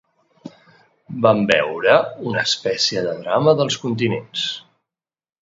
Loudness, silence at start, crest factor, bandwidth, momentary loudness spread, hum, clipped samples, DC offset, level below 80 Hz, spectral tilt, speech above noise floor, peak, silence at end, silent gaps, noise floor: -18 LUFS; 0.45 s; 20 dB; 7.8 kHz; 8 LU; none; under 0.1%; under 0.1%; -60 dBFS; -4.5 dB/octave; 70 dB; 0 dBFS; 0.85 s; none; -88 dBFS